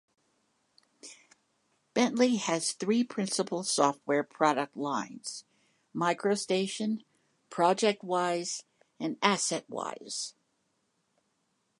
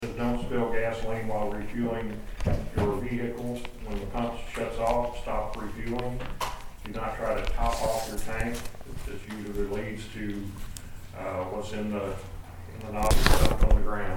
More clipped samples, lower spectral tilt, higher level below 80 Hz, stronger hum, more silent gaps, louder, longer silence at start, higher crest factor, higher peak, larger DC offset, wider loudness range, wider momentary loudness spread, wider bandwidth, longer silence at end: neither; second, -3.5 dB/octave vs -5.5 dB/octave; second, -84 dBFS vs -32 dBFS; neither; neither; about the same, -30 LUFS vs -31 LUFS; first, 1.05 s vs 0 s; about the same, 24 dB vs 26 dB; second, -8 dBFS vs -2 dBFS; second, under 0.1% vs 0.1%; about the same, 4 LU vs 6 LU; about the same, 14 LU vs 13 LU; second, 11.5 kHz vs 18 kHz; first, 1.5 s vs 0 s